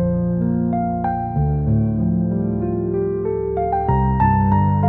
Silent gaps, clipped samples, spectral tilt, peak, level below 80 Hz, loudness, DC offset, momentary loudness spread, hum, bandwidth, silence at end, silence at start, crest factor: none; under 0.1%; -13 dB/octave; -4 dBFS; -32 dBFS; -19 LUFS; 0.1%; 5 LU; none; 3 kHz; 0 s; 0 s; 14 dB